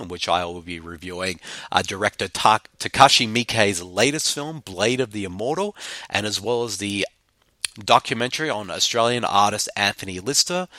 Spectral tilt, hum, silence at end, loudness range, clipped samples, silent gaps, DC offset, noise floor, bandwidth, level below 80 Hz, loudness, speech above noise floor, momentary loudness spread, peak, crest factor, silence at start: -2.5 dB/octave; none; 0 s; 5 LU; under 0.1%; none; under 0.1%; -64 dBFS; 16.5 kHz; -56 dBFS; -21 LUFS; 42 dB; 11 LU; 0 dBFS; 22 dB; 0 s